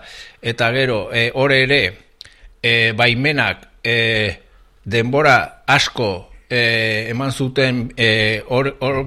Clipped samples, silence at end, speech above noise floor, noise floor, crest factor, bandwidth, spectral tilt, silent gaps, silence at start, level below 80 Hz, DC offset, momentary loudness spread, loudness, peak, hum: under 0.1%; 0 s; 26 dB; -43 dBFS; 16 dB; 13.5 kHz; -5 dB/octave; none; 0.05 s; -44 dBFS; under 0.1%; 9 LU; -16 LUFS; 0 dBFS; none